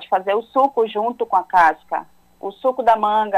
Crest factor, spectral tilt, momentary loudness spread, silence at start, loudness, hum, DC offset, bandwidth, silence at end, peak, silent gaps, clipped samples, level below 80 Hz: 14 dB; -5 dB/octave; 12 LU; 0 s; -18 LUFS; none; under 0.1%; 14 kHz; 0 s; -4 dBFS; none; under 0.1%; -58 dBFS